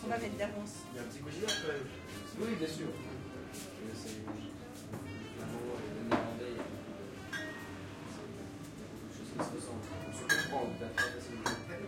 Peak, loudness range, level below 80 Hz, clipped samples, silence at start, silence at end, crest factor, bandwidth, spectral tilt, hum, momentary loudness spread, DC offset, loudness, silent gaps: -18 dBFS; 6 LU; -64 dBFS; under 0.1%; 0 s; 0 s; 22 dB; 16.5 kHz; -4 dB/octave; none; 11 LU; under 0.1%; -40 LUFS; none